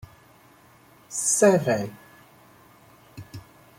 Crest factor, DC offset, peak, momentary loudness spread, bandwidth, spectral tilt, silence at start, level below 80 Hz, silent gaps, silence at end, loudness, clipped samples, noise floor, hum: 22 dB; under 0.1%; -6 dBFS; 26 LU; 16.5 kHz; -4 dB/octave; 1.1 s; -64 dBFS; none; 0.4 s; -22 LUFS; under 0.1%; -54 dBFS; none